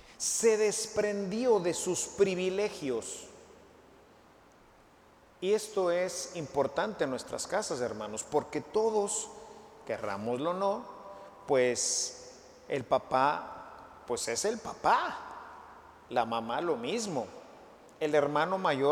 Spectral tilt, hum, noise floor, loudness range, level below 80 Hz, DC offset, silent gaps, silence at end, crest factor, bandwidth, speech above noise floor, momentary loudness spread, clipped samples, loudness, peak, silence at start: -3 dB/octave; none; -60 dBFS; 5 LU; -68 dBFS; under 0.1%; none; 0 s; 20 dB; 16.5 kHz; 29 dB; 19 LU; under 0.1%; -31 LUFS; -12 dBFS; 0.05 s